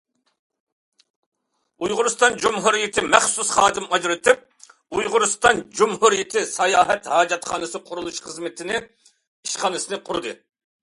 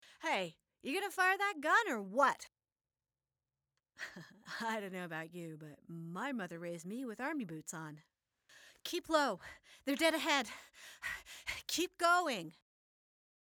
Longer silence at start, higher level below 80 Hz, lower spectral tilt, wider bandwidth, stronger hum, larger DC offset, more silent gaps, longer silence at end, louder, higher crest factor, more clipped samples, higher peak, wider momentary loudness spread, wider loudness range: first, 1.8 s vs 0.05 s; first, -58 dBFS vs -76 dBFS; second, -1.5 dB/octave vs -3 dB/octave; second, 11.5 kHz vs over 20 kHz; neither; neither; first, 9.27-9.43 s vs none; second, 0.45 s vs 0.9 s; first, -20 LUFS vs -36 LUFS; about the same, 22 dB vs 22 dB; neither; first, 0 dBFS vs -18 dBFS; second, 13 LU vs 18 LU; second, 6 LU vs 9 LU